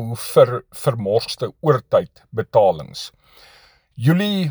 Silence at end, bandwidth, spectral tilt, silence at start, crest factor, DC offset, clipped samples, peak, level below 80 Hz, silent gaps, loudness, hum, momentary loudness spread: 0 s; over 20 kHz; -6.5 dB/octave; 0 s; 20 dB; under 0.1%; under 0.1%; 0 dBFS; -56 dBFS; none; -19 LUFS; none; 13 LU